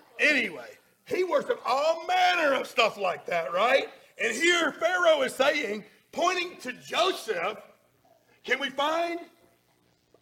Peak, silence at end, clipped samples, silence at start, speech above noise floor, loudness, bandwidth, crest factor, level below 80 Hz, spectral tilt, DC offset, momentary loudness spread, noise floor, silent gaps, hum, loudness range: -8 dBFS; 0.95 s; under 0.1%; 0.15 s; 41 dB; -26 LUFS; 17 kHz; 18 dB; -76 dBFS; -2 dB/octave; under 0.1%; 11 LU; -67 dBFS; none; none; 6 LU